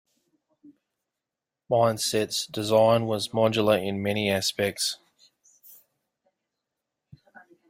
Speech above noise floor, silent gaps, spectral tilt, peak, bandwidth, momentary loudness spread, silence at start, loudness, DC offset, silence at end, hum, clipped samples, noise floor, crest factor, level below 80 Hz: 64 dB; none; -4 dB/octave; -8 dBFS; 16 kHz; 7 LU; 1.7 s; -24 LUFS; under 0.1%; 2.75 s; none; under 0.1%; -88 dBFS; 20 dB; -66 dBFS